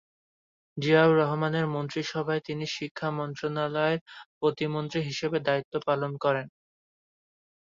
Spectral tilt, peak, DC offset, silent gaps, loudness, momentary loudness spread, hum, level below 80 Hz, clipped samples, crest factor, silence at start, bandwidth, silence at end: -6 dB/octave; -8 dBFS; under 0.1%; 2.91-2.95 s, 4.01-4.06 s, 4.26-4.41 s, 5.65-5.72 s; -28 LUFS; 10 LU; none; -70 dBFS; under 0.1%; 22 dB; 0.75 s; 7.6 kHz; 1.25 s